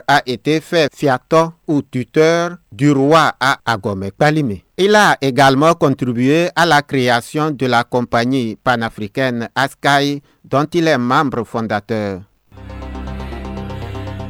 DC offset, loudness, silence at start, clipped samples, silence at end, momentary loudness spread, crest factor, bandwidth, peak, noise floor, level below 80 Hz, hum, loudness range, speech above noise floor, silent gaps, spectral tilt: under 0.1%; -15 LUFS; 0.1 s; under 0.1%; 0 s; 15 LU; 14 dB; 17 kHz; -2 dBFS; -34 dBFS; -40 dBFS; none; 6 LU; 19 dB; none; -5.5 dB/octave